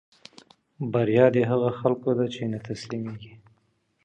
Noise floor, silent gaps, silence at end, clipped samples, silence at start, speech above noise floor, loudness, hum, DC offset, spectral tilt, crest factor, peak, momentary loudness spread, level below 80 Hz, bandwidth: -69 dBFS; none; 0.7 s; under 0.1%; 0.8 s; 45 dB; -25 LUFS; none; under 0.1%; -7.5 dB/octave; 22 dB; -4 dBFS; 15 LU; -64 dBFS; 9.2 kHz